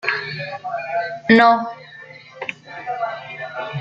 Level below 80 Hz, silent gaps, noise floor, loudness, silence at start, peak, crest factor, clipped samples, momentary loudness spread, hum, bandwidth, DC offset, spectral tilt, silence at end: -64 dBFS; none; -41 dBFS; -20 LUFS; 0.05 s; -2 dBFS; 20 dB; under 0.1%; 23 LU; none; 7.6 kHz; under 0.1%; -6.5 dB/octave; 0 s